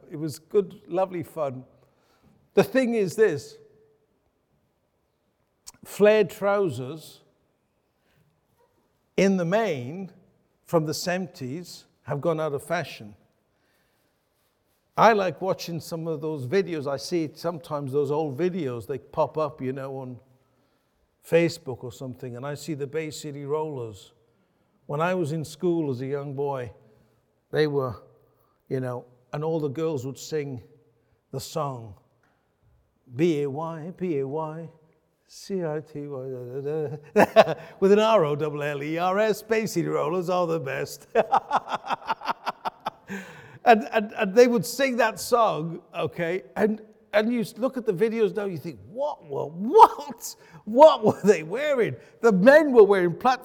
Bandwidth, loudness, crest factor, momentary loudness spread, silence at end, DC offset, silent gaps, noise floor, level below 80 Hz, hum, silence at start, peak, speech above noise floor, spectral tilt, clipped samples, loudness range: 18.5 kHz; -24 LUFS; 24 dB; 18 LU; 0 s; under 0.1%; none; -72 dBFS; -68 dBFS; none; 0.1 s; -2 dBFS; 48 dB; -6 dB/octave; under 0.1%; 10 LU